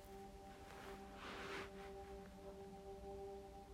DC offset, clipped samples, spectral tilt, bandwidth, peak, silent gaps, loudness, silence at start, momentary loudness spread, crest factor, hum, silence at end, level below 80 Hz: under 0.1%; under 0.1%; -4.5 dB/octave; 16 kHz; -36 dBFS; none; -54 LUFS; 0 s; 7 LU; 18 dB; none; 0 s; -64 dBFS